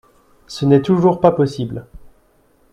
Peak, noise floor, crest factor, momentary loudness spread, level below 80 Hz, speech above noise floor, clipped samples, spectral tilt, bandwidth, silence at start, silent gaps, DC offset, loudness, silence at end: 0 dBFS; -56 dBFS; 18 dB; 17 LU; -48 dBFS; 41 dB; under 0.1%; -8 dB/octave; 11.5 kHz; 0.5 s; none; under 0.1%; -16 LUFS; 0.75 s